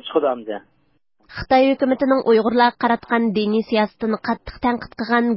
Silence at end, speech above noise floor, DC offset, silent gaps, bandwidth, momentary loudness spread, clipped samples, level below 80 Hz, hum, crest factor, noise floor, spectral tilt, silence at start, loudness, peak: 0 s; 46 dB; under 0.1%; none; 5.8 kHz; 11 LU; under 0.1%; -48 dBFS; none; 16 dB; -64 dBFS; -10 dB/octave; 0.05 s; -19 LUFS; -4 dBFS